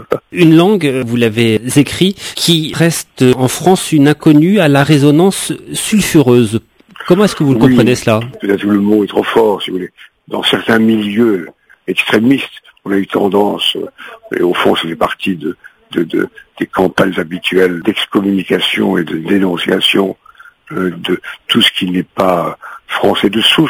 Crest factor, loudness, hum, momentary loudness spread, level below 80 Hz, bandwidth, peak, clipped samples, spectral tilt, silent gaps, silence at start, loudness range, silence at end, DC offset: 12 dB; -12 LUFS; none; 12 LU; -46 dBFS; 16 kHz; 0 dBFS; 0.3%; -5 dB/octave; none; 0 s; 5 LU; 0 s; under 0.1%